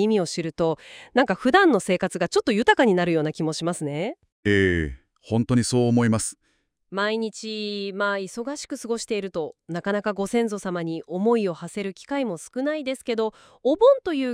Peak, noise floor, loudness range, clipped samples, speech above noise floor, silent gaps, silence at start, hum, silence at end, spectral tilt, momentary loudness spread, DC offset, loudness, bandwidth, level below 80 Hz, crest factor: -4 dBFS; -69 dBFS; 7 LU; under 0.1%; 46 dB; 4.32-4.43 s; 0 s; none; 0 s; -5 dB/octave; 13 LU; under 0.1%; -24 LUFS; 15.5 kHz; -52 dBFS; 20 dB